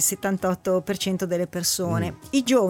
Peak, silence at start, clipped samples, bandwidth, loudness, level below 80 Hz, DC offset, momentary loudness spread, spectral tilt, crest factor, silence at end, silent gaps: -8 dBFS; 0 s; under 0.1%; 17 kHz; -24 LUFS; -56 dBFS; under 0.1%; 4 LU; -4 dB/octave; 16 dB; 0 s; none